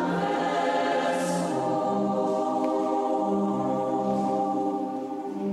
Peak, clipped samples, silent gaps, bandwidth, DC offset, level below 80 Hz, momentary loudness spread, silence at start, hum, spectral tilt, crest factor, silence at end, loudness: -14 dBFS; under 0.1%; none; 13.5 kHz; under 0.1%; -68 dBFS; 4 LU; 0 s; none; -6 dB/octave; 12 dB; 0 s; -26 LUFS